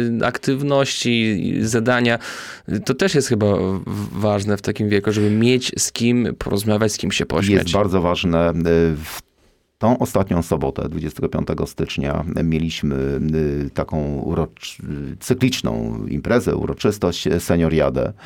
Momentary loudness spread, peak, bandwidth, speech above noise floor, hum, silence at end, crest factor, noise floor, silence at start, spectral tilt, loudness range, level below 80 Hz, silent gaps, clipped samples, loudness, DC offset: 8 LU; 0 dBFS; 17.5 kHz; 40 dB; none; 0 s; 18 dB; -59 dBFS; 0 s; -5.5 dB/octave; 4 LU; -38 dBFS; none; under 0.1%; -20 LUFS; under 0.1%